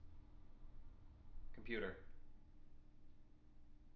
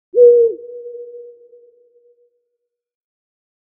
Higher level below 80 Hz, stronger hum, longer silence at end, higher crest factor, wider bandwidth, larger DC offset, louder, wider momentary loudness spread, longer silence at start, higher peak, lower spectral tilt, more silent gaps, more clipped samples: first, -62 dBFS vs -72 dBFS; neither; second, 0 s vs 2.5 s; about the same, 20 dB vs 18 dB; first, 4.8 kHz vs 0.9 kHz; neither; second, -50 LUFS vs -11 LUFS; second, 21 LU vs 24 LU; second, 0 s vs 0.15 s; second, -32 dBFS vs -2 dBFS; second, -4 dB/octave vs -11 dB/octave; neither; neither